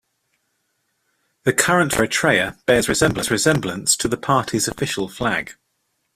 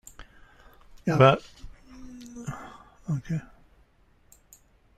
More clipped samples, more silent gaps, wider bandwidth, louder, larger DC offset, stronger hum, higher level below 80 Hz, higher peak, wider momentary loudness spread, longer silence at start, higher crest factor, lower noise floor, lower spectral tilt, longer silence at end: neither; neither; first, 16 kHz vs 14 kHz; first, -19 LUFS vs -25 LUFS; neither; neither; first, -46 dBFS vs -54 dBFS; about the same, -2 dBFS vs -4 dBFS; second, 7 LU vs 27 LU; first, 1.45 s vs 0.2 s; about the same, 20 dB vs 24 dB; first, -71 dBFS vs -61 dBFS; second, -3.5 dB/octave vs -7 dB/octave; second, 0.65 s vs 1.55 s